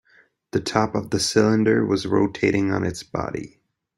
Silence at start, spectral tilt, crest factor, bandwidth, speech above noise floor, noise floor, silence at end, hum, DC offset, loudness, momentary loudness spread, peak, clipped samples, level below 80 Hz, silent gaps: 0.55 s; -5 dB/octave; 20 dB; 15.5 kHz; 37 dB; -58 dBFS; 0.5 s; none; under 0.1%; -22 LUFS; 11 LU; -2 dBFS; under 0.1%; -54 dBFS; none